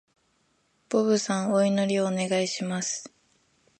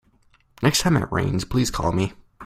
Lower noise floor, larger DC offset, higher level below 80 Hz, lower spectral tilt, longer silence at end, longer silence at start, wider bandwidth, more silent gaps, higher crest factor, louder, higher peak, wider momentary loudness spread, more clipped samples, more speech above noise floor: first, -69 dBFS vs -59 dBFS; neither; second, -74 dBFS vs -40 dBFS; about the same, -4.5 dB/octave vs -5 dB/octave; first, 0.7 s vs 0 s; first, 0.9 s vs 0.6 s; second, 11 kHz vs 16 kHz; neither; about the same, 18 dB vs 22 dB; second, -26 LUFS vs -22 LUFS; second, -10 dBFS vs -2 dBFS; about the same, 6 LU vs 5 LU; neither; first, 44 dB vs 38 dB